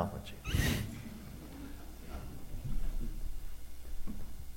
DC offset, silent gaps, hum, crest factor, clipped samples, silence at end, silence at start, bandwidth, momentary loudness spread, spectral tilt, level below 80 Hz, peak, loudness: under 0.1%; none; none; 20 dB; under 0.1%; 0 s; 0 s; 17 kHz; 16 LU; -5 dB/octave; -40 dBFS; -16 dBFS; -42 LUFS